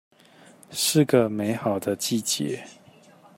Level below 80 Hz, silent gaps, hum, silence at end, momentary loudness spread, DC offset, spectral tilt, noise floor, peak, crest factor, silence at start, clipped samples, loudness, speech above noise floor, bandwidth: -68 dBFS; none; none; 0.65 s; 11 LU; under 0.1%; -4 dB/octave; -53 dBFS; -6 dBFS; 20 dB; 0.7 s; under 0.1%; -24 LUFS; 29 dB; 16.5 kHz